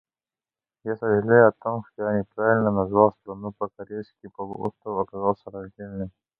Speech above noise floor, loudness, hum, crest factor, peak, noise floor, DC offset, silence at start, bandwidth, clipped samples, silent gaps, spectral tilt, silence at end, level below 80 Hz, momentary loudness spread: over 66 dB; -23 LUFS; none; 22 dB; -2 dBFS; under -90 dBFS; under 0.1%; 0.85 s; 4.4 kHz; under 0.1%; none; -11.5 dB/octave; 0.3 s; -56 dBFS; 18 LU